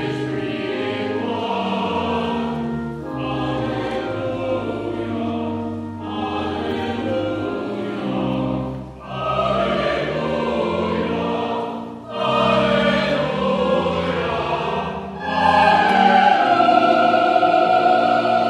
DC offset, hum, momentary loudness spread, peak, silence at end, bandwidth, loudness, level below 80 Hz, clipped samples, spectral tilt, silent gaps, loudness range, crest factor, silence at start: under 0.1%; none; 12 LU; -2 dBFS; 0 s; 11 kHz; -20 LUFS; -46 dBFS; under 0.1%; -6.5 dB/octave; none; 9 LU; 18 dB; 0 s